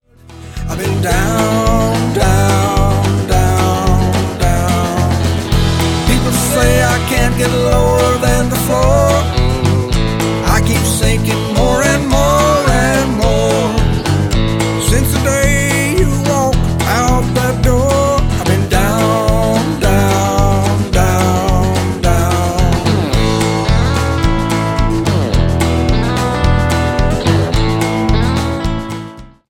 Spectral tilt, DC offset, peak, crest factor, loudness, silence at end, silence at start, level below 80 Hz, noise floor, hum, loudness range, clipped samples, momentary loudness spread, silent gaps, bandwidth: -5.5 dB/octave; under 0.1%; 0 dBFS; 12 dB; -13 LUFS; 0.25 s; 0.3 s; -20 dBFS; -34 dBFS; none; 2 LU; under 0.1%; 3 LU; none; 17.5 kHz